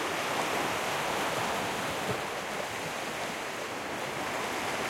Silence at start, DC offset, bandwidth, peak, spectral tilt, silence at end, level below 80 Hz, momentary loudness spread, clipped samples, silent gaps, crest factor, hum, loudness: 0 s; under 0.1%; 16.5 kHz; -18 dBFS; -2.5 dB/octave; 0 s; -62 dBFS; 5 LU; under 0.1%; none; 16 dB; none; -32 LUFS